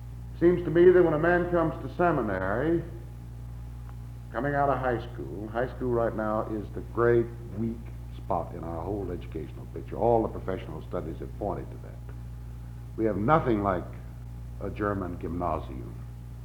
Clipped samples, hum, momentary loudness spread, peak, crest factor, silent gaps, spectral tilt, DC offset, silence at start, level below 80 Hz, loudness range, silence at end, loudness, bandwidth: under 0.1%; none; 18 LU; -8 dBFS; 20 dB; none; -9 dB/octave; under 0.1%; 0 s; -42 dBFS; 7 LU; 0 s; -28 LUFS; 6.6 kHz